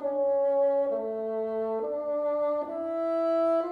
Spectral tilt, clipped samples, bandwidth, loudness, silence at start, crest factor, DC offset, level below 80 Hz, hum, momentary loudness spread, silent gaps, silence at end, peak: -7.5 dB/octave; under 0.1%; 4.9 kHz; -28 LUFS; 0 s; 10 dB; under 0.1%; -74 dBFS; none; 6 LU; none; 0 s; -18 dBFS